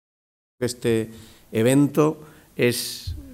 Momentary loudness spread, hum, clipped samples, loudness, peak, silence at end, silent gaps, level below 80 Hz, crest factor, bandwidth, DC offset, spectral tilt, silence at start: 16 LU; none; under 0.1%; -22 LUFS; -6 dBFS; 0 s; none; -48 dBFS; 18 dB; 16 kHz; under 0.1%; -5.5 dB/octave; 0.6 s